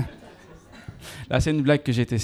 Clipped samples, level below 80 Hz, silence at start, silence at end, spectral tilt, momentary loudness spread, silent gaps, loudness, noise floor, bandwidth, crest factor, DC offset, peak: under 0.1%; -42 dBFS; 0 s; 0 s; -6.5 dB/octave; 22 LU; none; -23 LUFS; -47 dBFS; 14 kHz; 18 dB; under 0.1%; -6 dBFS